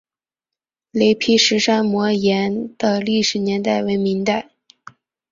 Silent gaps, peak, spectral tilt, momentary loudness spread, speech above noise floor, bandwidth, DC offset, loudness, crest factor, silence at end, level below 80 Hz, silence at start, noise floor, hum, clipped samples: none; -2 dBFS; -4 dB/octave; 7 LU; 70 dB; 7.6 kHz; under 0.1%; -18 LUFS; 16 dB; 0.9 s; -58 dBFS; 0.95 s; -87 dBFS; none; under 0.1%